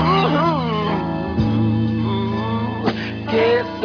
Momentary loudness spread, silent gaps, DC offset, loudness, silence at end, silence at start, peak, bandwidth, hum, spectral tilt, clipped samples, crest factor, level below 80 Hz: 6 LU; none; under 0.1%; -19 LUFS; 0 s; 0 s; -6 dBFS; 5.4 kHz; none; -8 dB/octave; under 0.1%; 14 dB; -40 dBFS